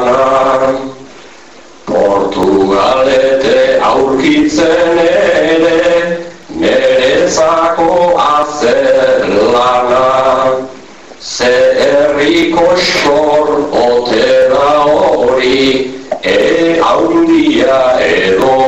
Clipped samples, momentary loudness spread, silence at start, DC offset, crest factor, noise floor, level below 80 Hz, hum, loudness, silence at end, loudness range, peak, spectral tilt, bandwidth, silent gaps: under 0.1%; 5 LU; 0 s; 1%; 8 dB; -36 dBFS; -40 dBFS; none; -9 LUFS; 0 s; 1 LU; -2 dBFS; -4 dB/octave; 8.2 kHz; none